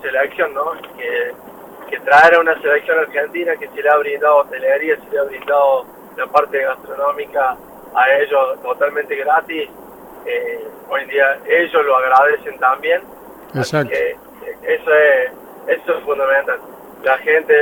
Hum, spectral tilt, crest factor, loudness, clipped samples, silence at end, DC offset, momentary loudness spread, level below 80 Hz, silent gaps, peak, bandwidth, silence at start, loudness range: none; -5 dB/octave; 16 dB; -16 LUFS; under 0.1%; 0 s; under 0.1%; 13 LU; -58 dBFS; none; 0 dBFS; over 20 kHz; 0 s; 4 LU